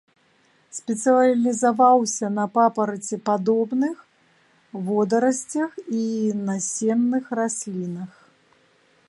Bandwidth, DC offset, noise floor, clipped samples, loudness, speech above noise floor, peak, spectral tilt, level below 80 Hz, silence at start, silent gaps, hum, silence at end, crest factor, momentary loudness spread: 11.5 kHz; under 0.1%; -61 dBFS; under 0.1%; -22 LUFS; 39 dB; -6 dBFS; -5 dB/octave; -74 dBFS; 0.75 s; none; none; 1 s; 18 dB; 14 LU